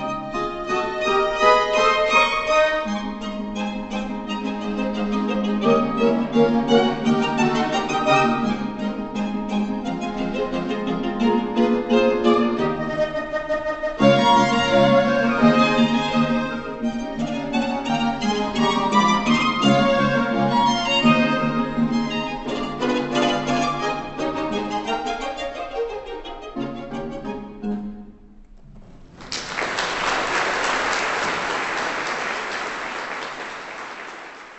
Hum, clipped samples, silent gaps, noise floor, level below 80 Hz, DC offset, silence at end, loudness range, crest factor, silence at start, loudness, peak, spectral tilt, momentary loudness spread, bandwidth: none; under 0.1%; none; -45 dBFS; -44 dBFS; under 0.1%; 0 s; 9 LU; 20 dB; 0 s; -21 LUFS; -2 dBFS; -5 dB/octave; 12 LU; 8.4 kHz